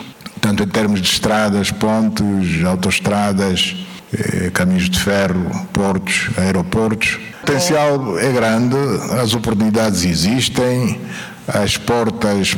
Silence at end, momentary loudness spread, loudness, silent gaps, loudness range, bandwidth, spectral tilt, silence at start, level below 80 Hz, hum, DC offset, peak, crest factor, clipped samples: 0 s; 6 LU; -16 LUFS; none; 1 LU; 19.5 kHz; -4.5 dB/octave; 0 s; -40 dBFS; none; under 0.1%; -2 dBFS; 14 dB; under 0.1%